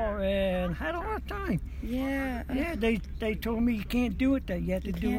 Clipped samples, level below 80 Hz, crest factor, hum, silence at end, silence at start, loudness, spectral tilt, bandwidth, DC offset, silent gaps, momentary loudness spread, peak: under 0.1%; -38 dBFS; 14 dB; none; 0 s; 0 s; -30 LUFS; -7 dB/octave; 16.5 kHz; under 0.1%; none; 6 LU; -16 dBFS